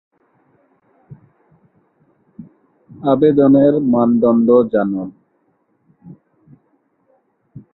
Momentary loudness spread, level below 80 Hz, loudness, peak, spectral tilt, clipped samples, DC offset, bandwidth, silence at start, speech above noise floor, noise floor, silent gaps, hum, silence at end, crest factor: 12 LU; -58 dBFS; -14 LUFS; -2 dBFS; -13 dB/octave; under 0.1%; under 0.1%; 4.1 kHz; 1.1 s; 50 dB; -62 dBFS; none; none; 0.15 s; 16 dB